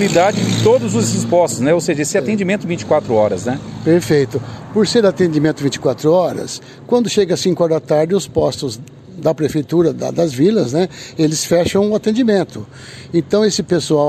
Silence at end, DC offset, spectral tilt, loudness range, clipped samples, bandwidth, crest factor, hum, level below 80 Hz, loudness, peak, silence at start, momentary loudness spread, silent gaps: 0 s; under 0.1%; -5.5 dB/octave; 2 LU; under 0.1%; 14 kHz; 12 dB; none; -48 dBFS; -16 LUFS; -2 dBFS; 0 s; 8 LU; none